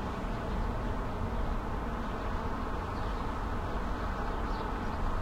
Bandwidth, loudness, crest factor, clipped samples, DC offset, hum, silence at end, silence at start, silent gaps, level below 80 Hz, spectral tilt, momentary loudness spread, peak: 12.5 kHz; -36 LUFS; 12 dB; under 0.1%; under 0.1%; none; 0 s; 0 s; none; -36 dBFS; -7 dB/octave; 1 LU; -22 dBFS